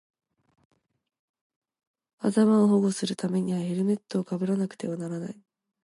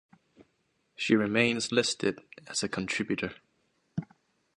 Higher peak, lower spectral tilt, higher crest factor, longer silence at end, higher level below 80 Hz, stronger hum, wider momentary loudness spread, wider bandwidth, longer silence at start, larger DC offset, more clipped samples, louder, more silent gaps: about the same, -10 dBFS vs -10 dBFS; first, -7 dB/octave vs -4 dB/octave; about the same, 18 dB vs 22 dB; about the same, 0.5 s vs 0.55 s; second, -76 dBFS vs -66 dBFS; neither; about the same, 13 LU vs 14 LU; about the same, 11.5 kHz vs 11.5 kHz; first, 2.2 s vs 0.4 s; neither; neither; first, -26 LUFS vs -29 LUFS; neither